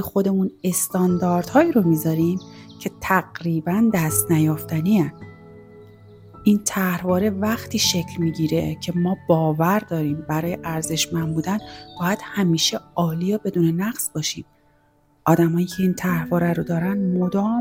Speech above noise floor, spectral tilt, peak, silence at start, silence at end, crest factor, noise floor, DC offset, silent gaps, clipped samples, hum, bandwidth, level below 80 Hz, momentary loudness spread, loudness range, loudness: 39 dB; -5 dB/octave; -4 dBFS; 0 s; 0 s; 18 dB; -59 dBFS; under 0.1%; none; under 0.1%; none; 17 kHz; -52 dBFS; 7 LU; 2 LU; -21 LUFS